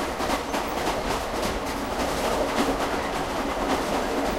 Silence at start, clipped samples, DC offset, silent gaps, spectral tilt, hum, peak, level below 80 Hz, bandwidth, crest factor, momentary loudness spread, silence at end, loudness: 0 s; under 0.1%; under 0.1%; none; -4 dB/octave; none; -10 dBFS; -40 dBFS; 16 kHz; 16 dB; 3 LU; 0 s; -26 LUFS